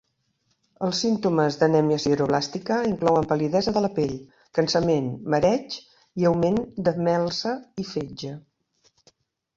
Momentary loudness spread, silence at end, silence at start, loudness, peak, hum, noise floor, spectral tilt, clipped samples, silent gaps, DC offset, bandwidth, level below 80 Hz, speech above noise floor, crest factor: 11 LU; 1.2 s; 0.8 s; -24 LUFS; -6 dBFS; none; -71 dBFS; -6 dB/octave; under 0.1%; none; under 0.1%; 7.8 kHz; -56 dBFS; 48 dB; 18 dB